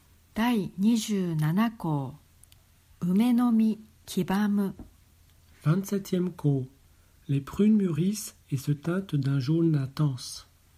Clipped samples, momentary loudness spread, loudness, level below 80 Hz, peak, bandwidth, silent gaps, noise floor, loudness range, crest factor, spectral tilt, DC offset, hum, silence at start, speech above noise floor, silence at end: under 0.1%; 11 LU; -27 LUFS; -60 dBFS; -12 dBFS; 16 kHz; none; -59 dBFS; 3 LU; 14 dB; -7 dB/octave; under 0.1%; none; 0.35 s; 33 dB; 0.35 s